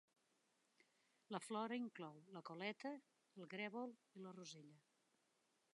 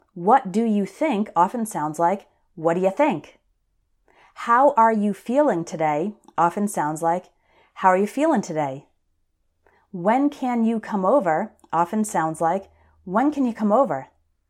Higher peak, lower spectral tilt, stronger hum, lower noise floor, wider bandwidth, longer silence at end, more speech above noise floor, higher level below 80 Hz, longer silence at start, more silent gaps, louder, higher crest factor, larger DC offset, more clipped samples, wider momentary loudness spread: second, -32 dBFS vs -4 dBFS; second, -4.5 dB/octave vs -6.5 dB/octave; neither; first, -84 dBFS vs -69 dBFS; second, 11 kHz vs 14 kHz; first, 0.95 s vs 0.45 s; second, 33 dB vs 48 dB; second, under -90 dBFS vs -66 dBFS; first, 1.3 s vs 0.15 s; neither; second, -52 LUFS vs -22 LUFS; about the same, 22 dB vs 18 dB; neither; neither; first, 13 LU vs 8 LU